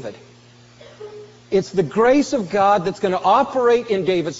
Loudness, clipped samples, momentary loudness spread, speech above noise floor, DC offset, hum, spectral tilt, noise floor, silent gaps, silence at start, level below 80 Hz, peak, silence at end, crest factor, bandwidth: -18 LUFS; under 0.1%; 21 LU; 29 dB; under 0.1%; none; -4.5 dB/octave; -47 dBFS; none; 0 s; -56 dBFS; -4 dBFS; 0 s; 16 dB; 8 kHz